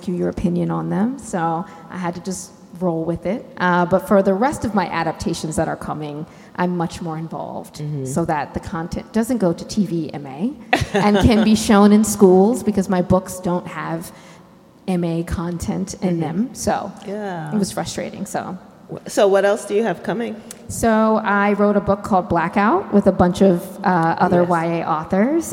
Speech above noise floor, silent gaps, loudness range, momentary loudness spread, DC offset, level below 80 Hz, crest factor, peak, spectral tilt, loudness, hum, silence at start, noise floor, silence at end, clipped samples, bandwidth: 28 dB; none; 9 LU; 14 LU; under 0.1%; -42 dBFS; 18 dB; 0 dBFS; -6 dB/octave; -19 LUFS; none; 0 s; -46 dBFS; 0 s; under 0.1%; 16.5 kHz